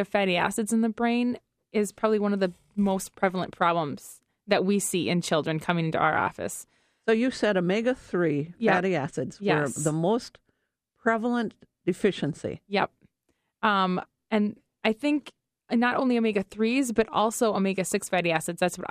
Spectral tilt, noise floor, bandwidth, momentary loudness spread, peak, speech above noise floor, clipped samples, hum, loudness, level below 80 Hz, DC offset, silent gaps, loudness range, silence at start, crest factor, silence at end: -5 dB/octave; -77 dBFS; 15.5 kHz; 8 LU; -8 dBFS; 51 dB; under 0.1%; none; -26 LUFS; -62 dBFS; under 0.1%; none; 3 LU; 0 s; 18 dB; 0 s